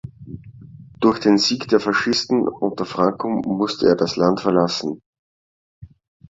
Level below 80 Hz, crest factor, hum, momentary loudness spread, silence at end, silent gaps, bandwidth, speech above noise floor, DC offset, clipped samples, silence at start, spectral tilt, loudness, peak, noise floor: -54 dBFS; 18 dB; none; 16 LU; 0.45 s; 5.06-5.13 s, 5.19-5.82 s; 7.8 kHz; 23 dB; under 0.1%; under 0.1%; 0.05 s; -5 dB/octave; -19 LUFS; -2 dBFS; -42 dBFS